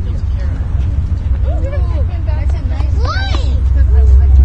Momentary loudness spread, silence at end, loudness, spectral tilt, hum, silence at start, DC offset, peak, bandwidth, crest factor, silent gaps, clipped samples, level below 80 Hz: 8 LU; 0 s; -15 LUFS; -7.5 dB/octave; none; 0 s; under 0.1%; 0 dBFS; 6 kHz; 12 dB; none; 0.1%; -12 dBFS